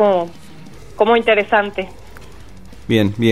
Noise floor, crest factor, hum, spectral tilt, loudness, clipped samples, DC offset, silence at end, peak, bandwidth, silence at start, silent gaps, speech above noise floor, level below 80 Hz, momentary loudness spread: -39 dBFS; 16 dB; none; -6.5 dB/octave; -16 LUFS; under 0.1%; 1%; 0 s; 0 dBFS; 15 kHz; 0 s; none; 24 dB; -44 dBFS; 16 LU